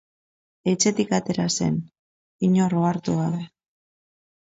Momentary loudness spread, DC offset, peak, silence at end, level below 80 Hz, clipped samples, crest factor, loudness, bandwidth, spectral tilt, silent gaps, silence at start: 9 LU; under 0.1%; -6 dBFS; 1.1 s; -60 dBFS; under 0.1%; 18 dB; -23 LUFS; 8 kHz; -5 dB/octave; 1.99-2.39 s; 0.65 s